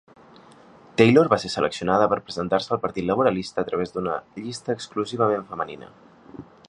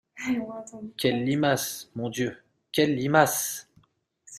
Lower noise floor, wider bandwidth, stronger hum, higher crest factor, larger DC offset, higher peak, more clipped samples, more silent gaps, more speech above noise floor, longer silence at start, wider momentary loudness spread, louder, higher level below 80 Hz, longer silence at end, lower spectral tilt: second, -50 dBFS vs -64 dBFS; second, 11 kHz vs 15.5 kHz; neither; about the same, 22 dB vs 22 dB; neither; about the same, -2 dBFS vs -4 dBFS; neither; neither; second, 27 dB vs 38 dB; first, 1 s vs 0.15 s; about the same, 14 LU vs 15 LU; first, -23 LUFS vs -26 LUFS; first, -56 dBFS vs -64 dBFS; first, 0.25 s vs 0 s; first, -6 dB/octave vs -4 dB/octave